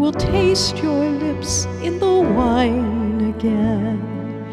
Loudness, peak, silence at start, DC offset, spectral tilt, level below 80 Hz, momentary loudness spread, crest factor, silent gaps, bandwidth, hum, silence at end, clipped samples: -19 LUFS; -6 dBFS; 0 s; under 0.1%; -5 dB/octave; -36 dBFS; 7 LU; 14 dB; none; 13 kHz; none; 0 s; under 0.1%